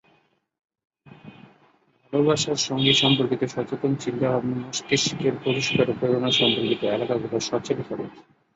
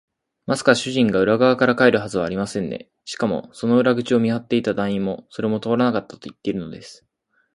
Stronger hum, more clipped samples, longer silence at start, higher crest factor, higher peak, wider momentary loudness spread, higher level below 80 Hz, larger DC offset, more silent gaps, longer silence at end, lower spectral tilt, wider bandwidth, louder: neither; neither; first, 1.1 s vs 0.5 s; about the same, 20 dB vs 20 dB; about the same, -4 dBFS vs -2 dBFS; second, 9 LU vs 13 LU; about the same, -60 dBFS vs -56 dBFS; neither; neither; second, 0.35 s vs 0.6 s; second, -4 dB/octave vs -5.5 dB/octave; second, 8 kHz vs 11.5 kHz; second, -23 LUFS vs -20 LUFS